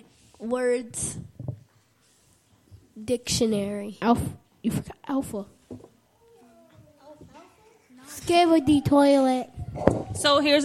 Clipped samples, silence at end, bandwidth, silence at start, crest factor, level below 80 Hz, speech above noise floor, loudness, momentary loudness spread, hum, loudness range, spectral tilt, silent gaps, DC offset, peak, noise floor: under 0.1%; 0 s; 15 kHz; 0.4 s; 24 dB; -50 dBFS; 39 dB; -24 LUFS; 20 LU; none; 12 LU; -4.5 dB/octave; none; under 0.1%; -2 dBFS; -63 dBFS